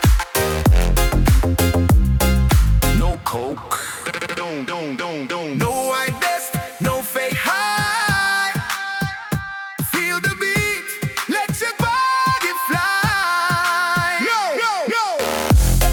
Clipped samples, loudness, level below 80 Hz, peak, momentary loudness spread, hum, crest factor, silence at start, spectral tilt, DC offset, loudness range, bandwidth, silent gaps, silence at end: under 0.1%; -19 LUFS; -24 dBFS; -4 dBFS; 9 LU; none; 14 dB; 0 s; -4.5 dB/octave; under 0.1%; 5 LU; over 20 kHz; none; 0 s